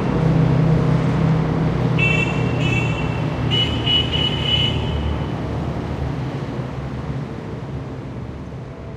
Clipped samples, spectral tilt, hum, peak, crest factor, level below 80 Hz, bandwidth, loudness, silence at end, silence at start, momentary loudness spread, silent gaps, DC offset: under 0.1%; -6.5 dB/octave; none; -4 dBFS; 14 dB; -32 dBFS; 8.6 kHz; -20 LUFS; 0 s; 0 s; 13 LU; none; under 0.1%